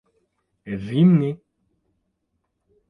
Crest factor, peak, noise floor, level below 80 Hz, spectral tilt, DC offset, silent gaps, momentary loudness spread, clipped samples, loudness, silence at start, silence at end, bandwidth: 18 dB; -6 dBFS; -75 dBFS; -60 dBFS; -10 dB/octave; under 0.1%; none; 17 LU; under 0.1%; -19 LUFS; 0.65 s; 1.55 s; 3.9 kHz